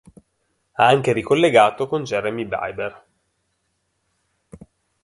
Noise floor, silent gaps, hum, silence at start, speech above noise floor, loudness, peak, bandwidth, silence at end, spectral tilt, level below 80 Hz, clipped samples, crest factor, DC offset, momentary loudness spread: -71 dBFS; none; none; 0.8 s; 53 dB; -19 LUFS; -2 dBFS; 11.5 kHz; 2.1 s; -5.5 dB/octave; -58 dBFS; under 0.1%; 20 dB; under 0.1%; 14 LU